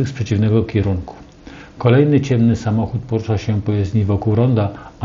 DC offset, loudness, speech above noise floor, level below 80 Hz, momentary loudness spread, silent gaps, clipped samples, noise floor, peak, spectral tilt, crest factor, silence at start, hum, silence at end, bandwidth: under 0.1%; -17 LUFS; 22 dB; -40 dBFS; 8 LU; none; under 0.1%; -38 dBFS; 0 dBFS; -8.5 dB/octave; 16 dB; 0 s; none; 0 s; 7.4 kHz